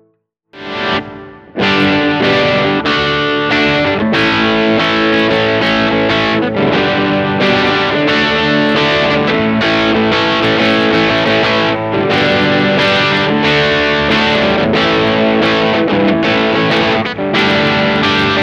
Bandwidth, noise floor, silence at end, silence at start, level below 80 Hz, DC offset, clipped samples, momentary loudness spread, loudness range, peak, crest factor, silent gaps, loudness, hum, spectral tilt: 9 kHz; -59 dBFS; 0 s; 0.55 s; -40 dBFS; under 0.1%; under 0.1%; 3 LU; 1 LU; -2 dBFS; 10 dB; none; -11 LUFS; none; -5.5 dB/octave